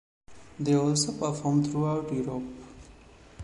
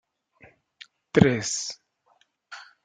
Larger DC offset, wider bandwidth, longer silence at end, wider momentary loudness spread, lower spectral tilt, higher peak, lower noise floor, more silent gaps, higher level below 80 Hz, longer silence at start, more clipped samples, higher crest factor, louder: neither; first, 11.5 kHz vs 9.6 kHz; second, 0 s vs 0.25 s; second, 16 LU vs 24 LU; about the same, -5.5 dB/octave vs -5 dB/octave; second, -12 dBFS vs -2 dBFS; second, -52 dBFS vs -66 dBFS; neither; about the same, -56 dBFS vs -56 dBFS; second, 0.3 s vs 1.15 s; neither; second, 16 dB vs 26 dB; second, -28 LUFS vs -24 LUFS